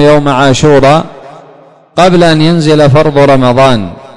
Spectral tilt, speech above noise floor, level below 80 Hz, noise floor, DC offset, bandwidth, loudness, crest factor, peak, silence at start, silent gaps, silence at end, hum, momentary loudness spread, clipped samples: -6 dB/octave; 32 dB; -32 dBFS; -37 dBFS; under 0.1%; 11 kHz; -6 LUFS; 6 dB; 0 dBFS; 0 s; none; 0.1 s; none; 5 LU; 2%